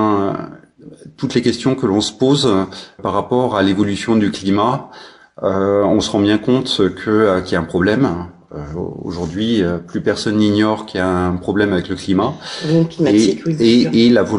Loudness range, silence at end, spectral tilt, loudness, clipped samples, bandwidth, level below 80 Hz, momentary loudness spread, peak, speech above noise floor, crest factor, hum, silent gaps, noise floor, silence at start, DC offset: 3 LU; 0 s; -6 dB/octave; -16 LUFS; under 0.1%; 11 kHz; -46 dBFS; 12 LU; -2 dBFS; 22 dB; 14 dB; none; none; -38 dBFS; 0 s; under 0.1%